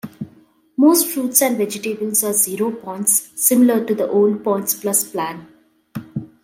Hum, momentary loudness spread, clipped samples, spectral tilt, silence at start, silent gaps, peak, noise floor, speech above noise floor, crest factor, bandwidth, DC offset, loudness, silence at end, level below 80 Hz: none; 18 LU; under 0.1%; -3.5 dB/octave; 0.05 s; none; 0 dBFS; -52 dBFS; 34 dB; 18 dB; 16.5 kHz; under 0.1%; -17 LUFS; 0.2 s; -66 dBFS